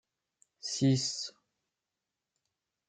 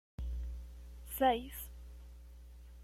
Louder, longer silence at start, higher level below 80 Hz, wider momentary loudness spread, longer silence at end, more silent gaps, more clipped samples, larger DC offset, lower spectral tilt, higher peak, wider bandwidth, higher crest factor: first, -32 LUFS vs -37 LUFS; first, 0.65 s vs 0.2 s; second, -74 dBFS vs -46 dBFS; second, 14 LU vs 24 LU; first, 1.6 s vs 0 s; neither; neither; neither; about the same, -5 dB/octave vs -5 dB/octave; about the same, -16 dBFS vs -18 dBFS; second, 9.4 kHz vs 16.5 kHz; about the same, 20 dB vs 22 dB